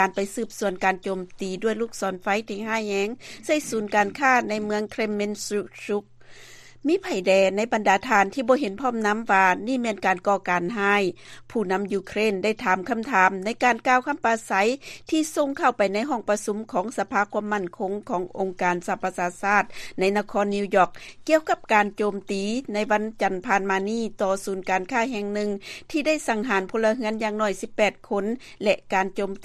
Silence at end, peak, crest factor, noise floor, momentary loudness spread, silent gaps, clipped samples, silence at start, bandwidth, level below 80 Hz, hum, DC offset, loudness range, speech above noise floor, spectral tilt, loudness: 0 s; -4 dBFS; 20 dB; -46 dBFS; 8 LU; none; under 0.1%; 0 s; 14 kHz; -56 dBFS; none; under 0.1%; 4 LU; 22 dB; -4.5 dB/octave; -24 LUFS